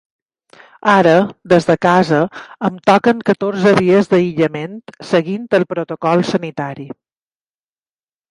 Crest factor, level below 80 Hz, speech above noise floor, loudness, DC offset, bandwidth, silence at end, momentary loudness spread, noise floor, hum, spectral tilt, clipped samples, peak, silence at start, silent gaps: 16 dB; -56 dBFS; over 76 dB; -15 LUFS; under 0.1%; 11 kHz; 1.45 s; 13 LU; under -90 dBFS; none; -6.5 dB/octave; under 0.1%; 0 dBFS; 0.85 s; none